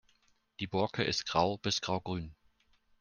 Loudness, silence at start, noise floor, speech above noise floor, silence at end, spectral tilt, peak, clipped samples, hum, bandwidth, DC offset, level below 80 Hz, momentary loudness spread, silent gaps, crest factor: -33 LUFS; 0.6 s; -71 dBFS; 38 dB; 0.65 s; -4 dB/octave; -12 dBFS; under 0.1%; none; 10 kHz; under 0.1%; -62 dBFS; 10 LU; none; 22 dB